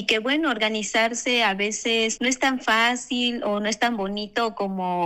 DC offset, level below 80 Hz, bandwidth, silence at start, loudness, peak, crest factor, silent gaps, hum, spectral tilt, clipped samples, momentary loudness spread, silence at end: under 0.1%; -58 dBFS; 16 kHz; 0 s; -22 LUFS; -4 dBFS; 18 dB; none; none; -2.5 dB/octave; under 0.1%; 6 LU; 0 s